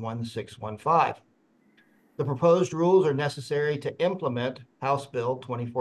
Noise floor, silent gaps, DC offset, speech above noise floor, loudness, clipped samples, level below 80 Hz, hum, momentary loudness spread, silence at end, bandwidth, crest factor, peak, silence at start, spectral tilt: -64 dBFS; none; under 0.1%; 38 dB; -26 LUFS; under 0.1%; -66 dBFS; none; 12 LU; 0 s; 12 kHz; 18 dB; -10 dBFS; 0 s; -6.5 dB/octave